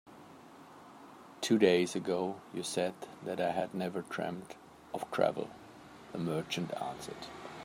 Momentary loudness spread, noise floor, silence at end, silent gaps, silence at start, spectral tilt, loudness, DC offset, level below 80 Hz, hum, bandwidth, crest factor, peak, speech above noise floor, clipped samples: 24 LU; -54 dBFS; 0 s; none; 0.05 s; -5 dB/octave; -35 LUFS; under 0.1%; -74 dBFS; none; 16 kHz; 24 dB; -12 dBFS; 20 dB; under 0.1%